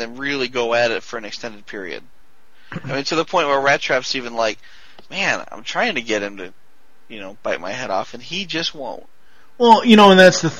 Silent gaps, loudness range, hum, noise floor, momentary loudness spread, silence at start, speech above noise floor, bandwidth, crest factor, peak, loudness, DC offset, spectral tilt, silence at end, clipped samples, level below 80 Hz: none; 8 LU; none; -56 dBFS; 23 LU; 0 s; 38 dB; 14.5 kHz; 18 dB; 0 dBFS; -17 LUFS; 1%; -4 dB/octave; 0 s; under 0.1%; -58 dBFS